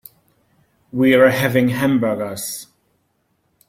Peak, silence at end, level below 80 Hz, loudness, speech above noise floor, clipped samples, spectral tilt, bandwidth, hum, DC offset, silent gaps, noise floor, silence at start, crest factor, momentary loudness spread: -2 dBFS; 1.05 s; -56 dBFS; -17 LUFS; 50 dB; under 0.1%; -5.5 dB/octave; 16.5 kHz; none; under 0.1%; none; -66 dBFS; 0.95 s; 18 dB; 15 LU